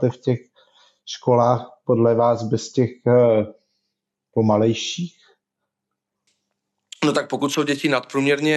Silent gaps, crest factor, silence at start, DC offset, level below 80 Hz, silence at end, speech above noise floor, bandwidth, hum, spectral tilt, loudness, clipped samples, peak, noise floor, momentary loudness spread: none; 16 dB; 0 s; under 0.1%; -76 dBFS; 0 s; 62 dB; 12.5 kHz; none; -6 dB/octave; -20 LUFS; under 0.1%; -6 dBFS; -81 dBFS; 10 LU